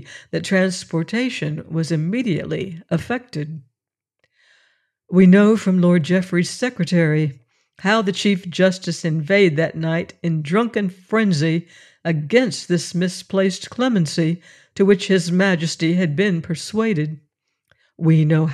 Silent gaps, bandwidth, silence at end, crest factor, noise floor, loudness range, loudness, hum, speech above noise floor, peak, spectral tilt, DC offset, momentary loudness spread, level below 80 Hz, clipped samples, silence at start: none; 12 kHz; 0 s; 16 dB; -83 dBFS; 6 LU; -19 LUFS; none; 64 dB; -4 dBFS; -6 dB/octave; under 0.1%; 10 LU; -62 dBFS; under 0.1%; 0 s